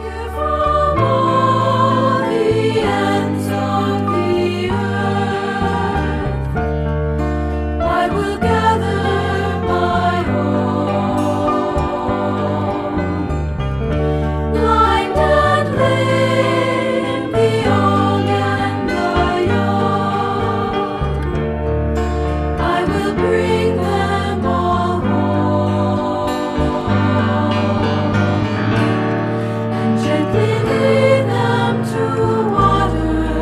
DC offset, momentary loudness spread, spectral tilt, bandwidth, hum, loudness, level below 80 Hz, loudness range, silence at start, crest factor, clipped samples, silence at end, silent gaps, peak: under 0.1%; 5 LU; -7 dB/octave; 13.5 kHz; none; -17 LUFS; -28 dBFS; 3 LU; 0 s; 16 dB; under 0.1%; 0 s; none; 0 dBFS